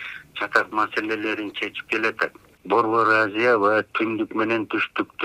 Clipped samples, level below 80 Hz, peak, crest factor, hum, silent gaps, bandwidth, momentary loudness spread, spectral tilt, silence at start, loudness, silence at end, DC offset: under 0.1%; -66 dBFS; -2 dBFS; 22 dB; none; none; 13.5 kHz; 9 LU; -5 dB/octave; 0 s; -22 LUFS; 0 s; under 0.1%